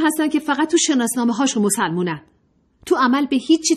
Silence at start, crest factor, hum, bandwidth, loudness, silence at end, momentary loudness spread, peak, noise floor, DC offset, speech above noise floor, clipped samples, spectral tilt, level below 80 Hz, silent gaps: 0 s; 14 dB; none; 14.5 kHz; -18 LUFS; 0 s; 7 LU; -4 dBFS; -56 dBFS; under 0.1%; 38 dB; under 0.1%; -3.5 dB/octave; -62 dBFS; none